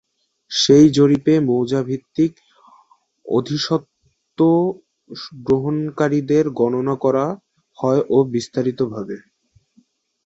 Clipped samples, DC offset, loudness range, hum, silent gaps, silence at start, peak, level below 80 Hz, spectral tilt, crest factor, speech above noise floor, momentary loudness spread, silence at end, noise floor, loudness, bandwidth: under 0.1%; under 0.1%; 5 LU; none; none; 0.5 s; -2 dBFS; -56 dBFS; -6 dB/octave; 18 dB; 42 dB; 16 LU; 1.05 s; -60 dBFS; -18 LUFS; 8 kHz